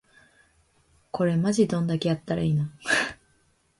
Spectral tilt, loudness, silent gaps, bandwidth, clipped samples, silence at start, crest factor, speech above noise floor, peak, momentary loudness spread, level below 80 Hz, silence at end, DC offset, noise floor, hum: -5.5 dB/octave; -25 LUFS; none; 11.5 kHz; under 0.1%; 1.15 s; 18 dB; 41 dB; -8 dBFS; 5 LU; -58 dBFS; 0.65 s; under 0.1%; -66 dBFS; none